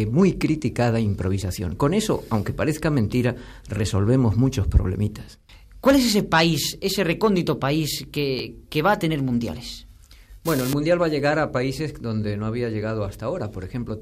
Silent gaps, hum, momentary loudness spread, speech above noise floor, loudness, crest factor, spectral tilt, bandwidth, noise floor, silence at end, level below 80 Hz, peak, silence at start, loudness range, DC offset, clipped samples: none; none; 10 LU; 24 dB; -23 LUFS; 18 dB; -6 dB/octave; 15.5 kHz; -46 dBFS; 0 s; -36 dBFS; -4 dBFS; 0 s; 3 LU; under 0.1%; under 0.1%